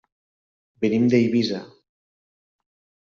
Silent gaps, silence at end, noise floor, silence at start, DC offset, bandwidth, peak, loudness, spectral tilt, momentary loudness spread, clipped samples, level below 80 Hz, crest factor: none; 1.35 s; under -90 dBFS; 0.8 s; under 0.1%; 7.2 kHz; -6 dBFS; -21 LUFS; -6 dB/octave; 9 LU; under 0.1%; -66 dBFS; 18 dB